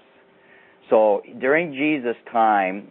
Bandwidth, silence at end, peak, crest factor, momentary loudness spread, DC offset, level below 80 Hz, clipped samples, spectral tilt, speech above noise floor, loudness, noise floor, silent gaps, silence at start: 4 kHz; 0.05 s; -4 dBFS; 18 dB; 6 LU; under 0.1%; -80 dBFS; under 0.1%; -10 dB/octave; 34 dB; -20 LUFS; -54 dBFS; none; 0.9 s